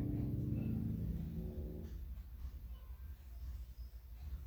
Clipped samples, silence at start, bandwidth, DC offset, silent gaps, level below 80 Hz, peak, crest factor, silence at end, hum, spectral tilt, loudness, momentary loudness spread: under 0.1%; 0 s; over 20 kHz; under 0.1%; none; -48 dBFS; -28 dBFS; 16 dB; 0 s; none; -9.5 dB/octave; -45 LUFS; 13 LU